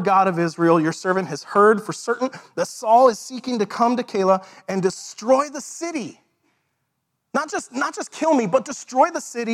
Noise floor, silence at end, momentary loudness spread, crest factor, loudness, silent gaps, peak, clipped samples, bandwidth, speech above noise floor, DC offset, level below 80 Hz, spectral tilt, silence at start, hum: -75 dBFS; 0 s; 12 LU; 18 dB; -21 LUFS; none; -2 dBFS; under 0.1%; 14 kHz; 55 dB; under 0.1%; -72 dBFS; -5 dB/octave; 0 s; none